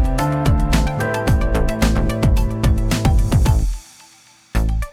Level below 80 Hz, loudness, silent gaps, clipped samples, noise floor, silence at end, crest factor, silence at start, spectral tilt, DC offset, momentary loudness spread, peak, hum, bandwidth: -20 dBFS; -18 LUFS; none; under 0.1%; -48 dBFS; 0 s; 16 dB; 0 s; -6 dB/octave; under 0.1%; 5 LU; 0 dBFS; none; 15.5 kHz